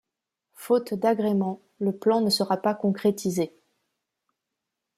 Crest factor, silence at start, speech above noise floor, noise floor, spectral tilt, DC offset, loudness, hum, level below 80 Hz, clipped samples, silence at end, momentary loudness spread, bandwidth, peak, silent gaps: 18 dB; 0.6 s; 60 dB; -85 dBFS; -5.5 dB/octave; under 0.1%; -25 LUFS; none; -72 dBFS; under 0.1%; 1.5 s; 7 LU; 15.5 kHz; -10 dBFS; none